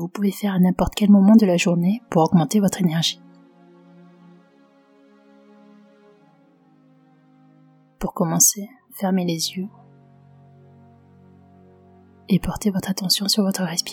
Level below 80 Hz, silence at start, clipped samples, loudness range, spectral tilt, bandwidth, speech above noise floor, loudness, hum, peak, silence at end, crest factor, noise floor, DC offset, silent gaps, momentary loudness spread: -46 dBFS; 0 s; under 0.1%; 13 LU; -4.5 dB/octave; 18.5 kHz; 37 dB; -19 LUFS; none; -2 dBFS; 0 s; 20 dB; -56 dBFS; under 0.1%; none; 14 LU